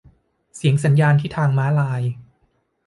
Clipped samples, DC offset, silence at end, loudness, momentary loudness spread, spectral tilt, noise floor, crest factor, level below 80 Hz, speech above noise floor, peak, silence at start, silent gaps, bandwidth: under 0.1%; under 0.1%; 0.65 s; -19 LUFS; 10 LU; -7.5 dB/octave; -65 dBFS; 14 dB; -54 dBFS; 48 dB; -6 dBFS; 0.55 s; none; 11.5 kHz